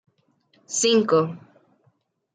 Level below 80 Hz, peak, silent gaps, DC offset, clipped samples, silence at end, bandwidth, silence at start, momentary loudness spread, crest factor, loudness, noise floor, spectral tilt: -76 dBFS; -6 dBFS; none; under 0.1%; under 0.1%; 0.95 s; 9.6 kHz; 0.7 s; 13 LU; 18 dB; -21 LUFS; -67 dBFS; -3.5 dB/octave